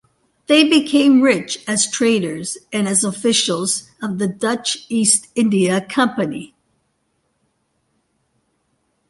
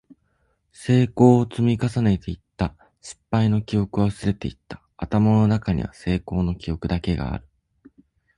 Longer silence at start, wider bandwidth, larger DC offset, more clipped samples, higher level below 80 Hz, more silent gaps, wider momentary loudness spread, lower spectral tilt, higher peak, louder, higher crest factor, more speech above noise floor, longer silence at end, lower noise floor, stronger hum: second, 0.5 s vs 0.8 s; about the same, 11.5 kHz vs 11 kHz; neither; neither; second, -64 dBFS vs -40 dBFS; neither; second, 11 LU vs 18 LU; second, -3 dB/octave vs -8 dB/octave; about the same, 0 dBFS vs -2 dBFS; first, -17 LUFS vs -22 LUFS; about the same, 18 dB vs 20 dB; first, 51 dB vs 47 dB; first, 2.65 s vs 0.95 s; about the same, -68 dBFS vs -68 dBFS; neither